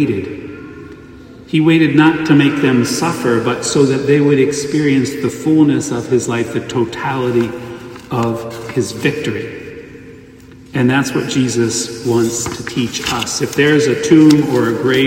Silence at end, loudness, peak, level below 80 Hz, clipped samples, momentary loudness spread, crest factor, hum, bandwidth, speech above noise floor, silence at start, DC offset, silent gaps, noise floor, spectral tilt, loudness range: 0 s; -14 LUFS; 0 dBFS; -48 dBFS; under 0.1%; 16 LU; 14 dB; none; 16.5 kHz; 25 dB; 0 s; under 0.1%; none; -38 dBFS; -5 dB/octave; 7 LU